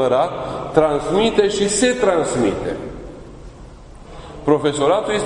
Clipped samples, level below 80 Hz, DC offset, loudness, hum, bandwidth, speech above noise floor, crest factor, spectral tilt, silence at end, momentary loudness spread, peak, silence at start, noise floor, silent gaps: under 0.1%; -40 dBFS; under 0.1%; -18 LUFS; none; 11 kHz; 21 dB; 18 dB; -4.5 dB/octave; 0 s; 19 LU; 0 dBFS; 0 s; -38 dBFS; none